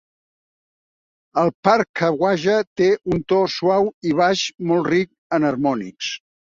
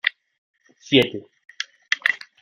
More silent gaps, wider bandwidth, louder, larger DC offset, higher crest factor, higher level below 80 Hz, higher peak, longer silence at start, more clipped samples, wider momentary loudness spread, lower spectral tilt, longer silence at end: first, 1.54-1.63 s, 1.89-1.94 s, 2.67-2.76 s, 3.94-4.01 s, 5.18-5.30 s vs 0.38-0.54 s; second, 7.6 kHz vs 16.5 kHz; about the same, -20 LUFS vs -22 LUFS; neither; second, 18 dB vs 24 dB; first, -56 dBFS vs -64 dBFS; about the same, -2 dBFS vs -2 dBFS; first, 1.35 s vs 0.05 s; neither; second, 6 LU vs 15 LU; first, -5.5 dB/octave vs -4 dB/octave; about the same, 0.3 s vs 0.25 s